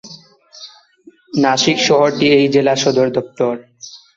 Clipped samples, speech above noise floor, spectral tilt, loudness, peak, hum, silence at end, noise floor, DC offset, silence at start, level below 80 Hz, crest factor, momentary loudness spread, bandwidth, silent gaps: under 0.1%; 34 dB; -4 dB/octave; -14 LUFS; -2 dBFS; none; 0.2 s; -47 dBFS; under 0.1%; 0.05 s; -58 dBFS; 14 dB; 23 LU; 7.8 kHz; none